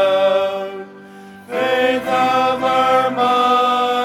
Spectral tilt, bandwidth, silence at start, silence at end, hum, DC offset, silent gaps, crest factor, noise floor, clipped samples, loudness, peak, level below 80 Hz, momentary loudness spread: -4 dB/octave; 16 kHz; 0 s; 0 s; none; under 0.1%; none; 14 dB; -38 dBFS; under 0.1%; -16 LUFS; -2 dBFS; -56 dBFS; 12 LU